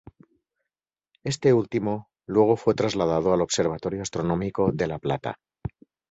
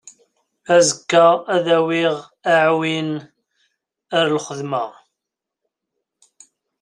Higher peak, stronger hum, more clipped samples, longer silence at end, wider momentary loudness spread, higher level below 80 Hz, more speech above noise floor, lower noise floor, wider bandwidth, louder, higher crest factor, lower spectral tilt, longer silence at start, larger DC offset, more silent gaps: second, -6 dBFS vs -2 dBFS; neither; neither; second, 0.45 s vs 1.9 s; first, 14 LU vs 11 LU; first, -52 dBFS vs -68 dBFS; about the same, 66 dB vs 66 dB; first, -89 dBFS vs -83 dBFS; second, 8.2 kHz vs 11 kHz; second, -24 LUFS vs -17 LUFS; about the same, 20 dB vs 18 dB; first, -5.5 dB/octave vs -3.5 dB/octave; first, 1.25 s vs 0.7 s; neither; neither